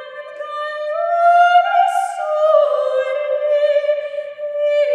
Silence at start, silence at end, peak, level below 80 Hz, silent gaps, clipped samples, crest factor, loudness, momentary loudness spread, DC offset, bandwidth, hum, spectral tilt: 0 s; 0 s; -2 dBFS; -90 dBFS; none; under 0.1%; 14 dB; -16 LUFS; 14 LU; under 0.1%; 10.5 kHz; none; 1 dB/octave